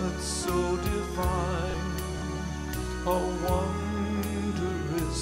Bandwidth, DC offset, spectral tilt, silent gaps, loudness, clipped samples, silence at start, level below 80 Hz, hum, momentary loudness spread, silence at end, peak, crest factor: 16 kHz; under 0.1%; -5.5 dB/octave; none; -30 LUFS; under 0.1%; 0 s; -36 dBFS; none; 5 LU; 0 s; -14 dBFS; 16 dB